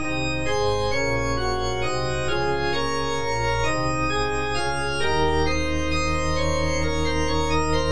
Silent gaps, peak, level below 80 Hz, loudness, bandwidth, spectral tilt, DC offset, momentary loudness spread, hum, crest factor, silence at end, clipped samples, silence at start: none; -10 dBFS; -34 dBFS; -24 LUFS; 10.5 kHz; -4.5 dB/octave; 3%; 3 LU; none; 14 dB; 0 s; under 0.1%; 0 s